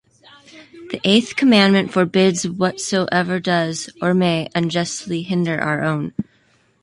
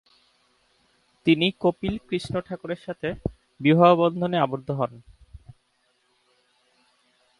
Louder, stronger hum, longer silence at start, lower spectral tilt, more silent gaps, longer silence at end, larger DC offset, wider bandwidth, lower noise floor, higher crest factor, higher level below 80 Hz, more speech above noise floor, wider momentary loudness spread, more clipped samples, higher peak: first, -18 LUFS vs -24 LUFS; neither; second, 0.55 s vs 1.25 s; second, -5 dB/octave vs -7.5 dB/octave; neither; second, 0.6 s vs 2 s; neither; about the same, 11.5 kHz vs 11.5 kHz; second, -58 dBFS vs -69 dBFS; about the same, 18 dB vs 22 dB; second, -58 dBFS vs -52 dBFS; second, 40 dB vs 46 dB; second, 10 LU vs 15 LU; neither; about the same, -2 dBFS vs -4 dBFS